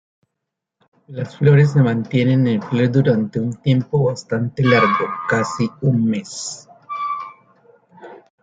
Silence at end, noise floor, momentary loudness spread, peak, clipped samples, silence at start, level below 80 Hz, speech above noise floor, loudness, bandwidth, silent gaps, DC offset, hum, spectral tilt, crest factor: 0.25 s; -80 dBFS; 15 LU; -2 dBFS; under 0.1%; 1.1 s; -56 dBFS; 63 dB; -18 LUFS; 9 kHz; none; under 0.1%; none; -7 dB/octave; 16 dB